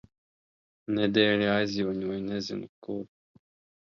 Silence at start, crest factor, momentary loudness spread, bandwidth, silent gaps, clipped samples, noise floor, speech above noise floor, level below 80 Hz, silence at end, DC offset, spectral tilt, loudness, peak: 0.9 s; 22 dB; 15 LU; 7.2 kHz; 2.69-2.82 s; under 0.1%; under -90 dBFS; over 62 dB; -64 dBFS; 0.75 s; under 0.1%; -5.5 dB/octave; -28 LUFS; -8 dBFS